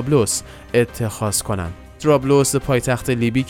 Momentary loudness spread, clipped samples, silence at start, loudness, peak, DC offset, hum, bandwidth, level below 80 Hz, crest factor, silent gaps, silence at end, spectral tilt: 8 LU; under 0.1%; 0 s; -19 LUFS; -2 dBFS; under 0.1%; none; 17.5 kHz; -40 dBFS; 16 dB; none; 0 s; -5 dB/octave